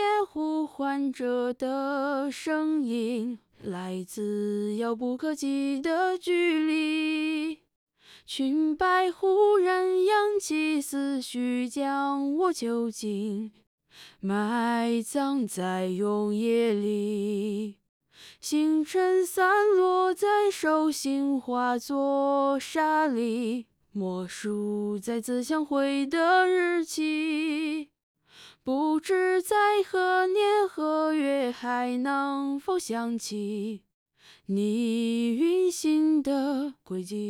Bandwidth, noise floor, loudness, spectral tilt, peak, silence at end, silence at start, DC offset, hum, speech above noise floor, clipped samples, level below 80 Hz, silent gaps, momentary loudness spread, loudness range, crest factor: 17 kHz; -54 dBFS; -27 LUFS; -4.5 dB/octave; -12 dBFS; 0 s; 0 s; under 0.1%; none; 28 dB; under 0.1%; -70 dBFS; 7.76-7.87 s, 13.67-13.78 s, 17.89-18.00 s, 28.03-28.15 s, 33.94-34.06 s; 9 LU; 5 LU; 16 dB